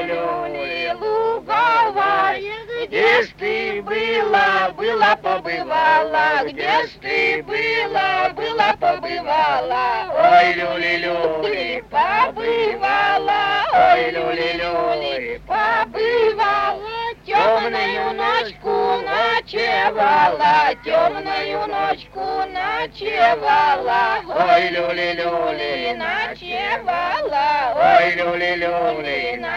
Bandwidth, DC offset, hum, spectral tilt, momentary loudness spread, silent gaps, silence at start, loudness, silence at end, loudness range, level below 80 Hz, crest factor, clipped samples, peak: 8.2 kHz; under 0.1%; none; -4.5 dB/octave; 8 LU; none; 0 s; -18 LUFS; 0 s; 2 LU; -50 dBFS; 18 dB; under 0.1%; 0 dBFS